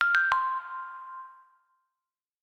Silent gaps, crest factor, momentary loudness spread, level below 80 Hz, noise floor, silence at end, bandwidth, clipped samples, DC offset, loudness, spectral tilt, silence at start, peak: none; 24 dB; 21 LU; -70 dBFS; under -90 dBFS; 1.1 s; 11.5 kHz; under 0.1%; under 0.1%; -27 LUFS; 0.5 dB/octave; 0 s; -8 dBFS